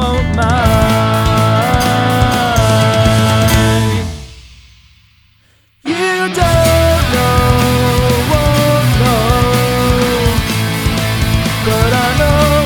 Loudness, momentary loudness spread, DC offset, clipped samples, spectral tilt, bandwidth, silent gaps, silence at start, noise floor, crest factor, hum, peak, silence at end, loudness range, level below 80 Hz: -12 LUFS; 4 LU; under 0.1%; under 0.1%; -5.5 dB/octave; over 20 kHz; none; 0 s; -52 dBFS; 12 dB; none; 0 dBFS; 0 s; 4 LU; -22 dBFS